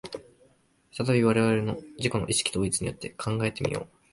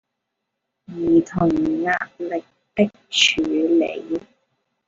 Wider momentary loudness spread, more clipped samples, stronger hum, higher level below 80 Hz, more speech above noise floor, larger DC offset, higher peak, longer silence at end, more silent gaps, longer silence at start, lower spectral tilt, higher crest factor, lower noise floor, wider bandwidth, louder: about the same, 13 LU vs 13 LU; neither; neither; about the same, -52 dBFS vs -52 dBFS; second, 37 dB vs 59 dB; neither; second, -8 dBFS vs -2 dBFS; second, 0.25 s vs 0.65 s; neither; second, 0.05 s vs 0.9 s; about the same, -4.5 dB/octave vs -4 dB/octave; about the same, 20 dB vs 20 dB; second, -63 dBFS vs -79 dBFS; first, 11.5 kHz vs 7.8 kHz; second, -27 LUFS vs -20 LUFS